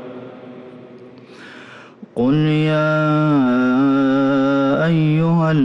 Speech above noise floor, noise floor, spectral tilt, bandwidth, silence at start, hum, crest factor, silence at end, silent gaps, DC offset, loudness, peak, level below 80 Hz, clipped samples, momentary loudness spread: 25 dB; -40 dBFS; -9 dB/octave; 7.2 kHz; 0 s; none; 8 dB; 0 s; none; under 0.1%; -16 LUFS; -8 dBFS; -54 dBFS; under 0.1%; 22 LU